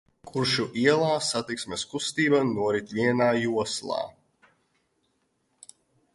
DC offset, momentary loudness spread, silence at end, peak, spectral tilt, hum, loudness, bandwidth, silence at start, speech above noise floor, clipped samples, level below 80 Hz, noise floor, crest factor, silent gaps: under 0.1%; 9 LU; 2.05 s; -6 dBFS; -4 dB/octave; none; -26 LUFS; 11.5 kHz; 0.25 s; 47 dB; under 0.1%; -64 dBFS; -73 dBFS; 20 dB; none